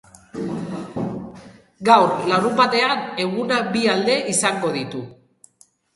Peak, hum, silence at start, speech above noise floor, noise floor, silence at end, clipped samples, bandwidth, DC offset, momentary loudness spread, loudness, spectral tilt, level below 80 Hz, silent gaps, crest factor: 0 dBFS; none; 0.35 s; 38 dB; -57 dBFS; 0.8 s; under 0.1%; 11.5 kHz; under 0.1%; 16 LU; -19 LUFS; -3.5 dB/octave; -60 dBFS; none; 20 dB